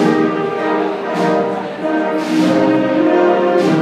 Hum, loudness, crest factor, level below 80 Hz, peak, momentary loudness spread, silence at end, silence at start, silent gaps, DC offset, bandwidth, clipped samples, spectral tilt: none; -15 LUFS; 14 dB; -60 dBFS; 0 dBFS; 6 LU; 0 s; 0 s; none; under 0.1%; 11 kHz; under 0.1%; -6.5 dB/octave